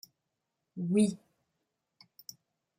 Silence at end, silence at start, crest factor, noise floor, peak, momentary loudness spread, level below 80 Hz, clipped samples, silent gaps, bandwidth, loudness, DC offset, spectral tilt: 1.65 s; 0.75 s; 20 dB; -85 dBFS; -16 dBFS; 22 LU; -78 dBFS; under 0.1%; none; 16 kHz; -30 LUFS; under 0.1%; -6.5 dB/octave